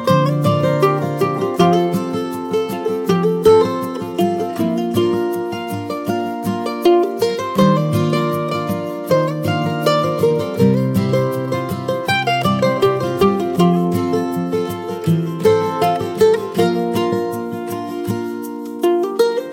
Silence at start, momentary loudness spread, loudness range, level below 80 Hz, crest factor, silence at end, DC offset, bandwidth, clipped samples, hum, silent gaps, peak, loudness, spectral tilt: 0 s; 8 LU; 2 LU; -54 dBFS; 16 dB; 0 s; under 0.1%; 17 kHz; under 0.1%; none; none; -2 dBFS; -17 LUFS; -6.5 dB/octave